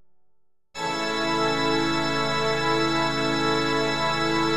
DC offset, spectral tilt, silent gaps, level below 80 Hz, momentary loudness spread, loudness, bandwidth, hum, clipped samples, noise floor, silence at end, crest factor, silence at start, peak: 2%; -4 dB/octave; none; -56 dBFS; 4 LU; -23 LUFS; 14 kHz; none; under 0.1%; -66 dBFS; 0 s; 14 dB; 0 s; -10 dBFS